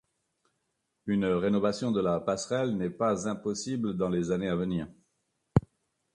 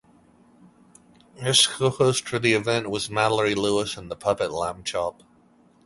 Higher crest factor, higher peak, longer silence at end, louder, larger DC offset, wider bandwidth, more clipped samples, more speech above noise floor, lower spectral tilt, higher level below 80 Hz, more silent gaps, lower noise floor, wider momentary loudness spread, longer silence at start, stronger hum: about the same, 22 dB vs 22 dB; second, -8 dBFS vs -4 dBFS; second, 0.55 s vs 0.75 s; second, -30 LUFS vs -23 LUFS; neither; about the same, 11 kHz vs 12 kHz; neither; first, 51 dB vs 34 dB; first, -6.5 dB/octave vs -3.5 dB/octave; about the same, -54 dBFS vs -56 dBFS; neither; first, -80 dBFS vs -58 dBFS; second, 6 LU vs 10 LU; second, 1.05 s vs 1.35 s; neither